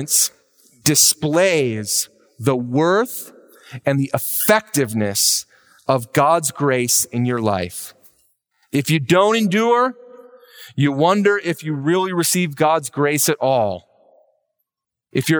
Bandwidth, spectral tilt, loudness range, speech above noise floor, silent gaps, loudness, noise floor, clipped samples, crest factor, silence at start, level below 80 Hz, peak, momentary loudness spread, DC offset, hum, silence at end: over 20 kHz; -3.5 dB/octave; 2 LU; 65 dB; none; -18 LUFS; -82 dBFS; under 0.1%; 18 dB; 0 s; -62 dBFS; -2 dBFS; 10 LU; under 0.1%; none; 0 s